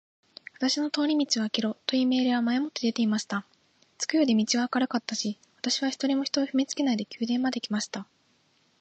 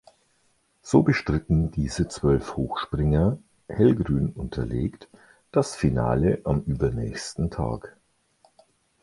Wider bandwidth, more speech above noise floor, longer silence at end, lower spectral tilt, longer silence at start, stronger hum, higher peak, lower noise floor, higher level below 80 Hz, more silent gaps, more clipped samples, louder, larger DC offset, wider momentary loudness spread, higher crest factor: second, 8.8 kHz vs 11.5 kHz; about the same, 40 dB vs 43 dB; second, 0.8 s vs 1.1 s; second, -3.5 dB/octave vs -7 dB/octave; second, 0.6 s vs 0.85 s; neither; second, -8 dBFS vs -4 dBFS; about the same, -67 dBFS vs -67 dBFS; second, -78 dBFS vs -38 dBFS; neither; neither; about the same, -27 LUFS vs -25 LUFS; neither; about the same, 9 LU vs 10 LU; about the same, 18 dB vs 20 dB